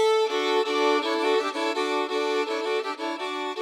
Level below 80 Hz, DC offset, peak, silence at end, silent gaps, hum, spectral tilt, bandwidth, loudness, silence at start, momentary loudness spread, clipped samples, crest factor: -86 dBFS; under 0.1%; -10 dBFS; 0 s; none; none; -0.5 dB/octave; 14.5 kHz; -25 LUFS; 0 s; 7 LU; under 0.1%; 16 dB